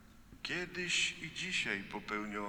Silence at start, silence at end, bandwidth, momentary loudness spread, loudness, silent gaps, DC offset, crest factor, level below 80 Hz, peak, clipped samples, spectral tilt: 0 s; 0 s; over 20 kHz; 8 LU; -36 LUFS; none; under 0.1%; 18 dB; -62 dBFS; -20 dBFS; under 0.1%; -2 dB/octave